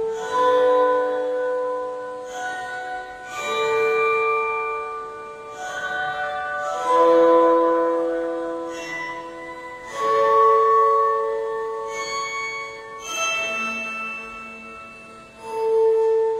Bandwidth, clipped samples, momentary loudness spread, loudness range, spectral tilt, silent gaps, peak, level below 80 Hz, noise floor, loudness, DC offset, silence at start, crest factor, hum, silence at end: 13.5 kHz; under 0.1%; 18 LU; 6 LU; -2.5 dB/octave; none; -6 dBFS; -62 dBFS; -42 dBFS; -21 LUFS; under 0.1%; 0 s; 16 dB; none; 0 s